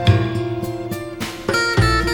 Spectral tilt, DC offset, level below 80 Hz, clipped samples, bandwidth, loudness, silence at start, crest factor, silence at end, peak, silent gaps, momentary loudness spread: -5.5 dB/octave; under 0.1%; -30 dBFS; under 0.1%; over 20 kHz; -20 LUFS; 0 s; 18 dB; 0 s; 0 dBFS; none; 11 LU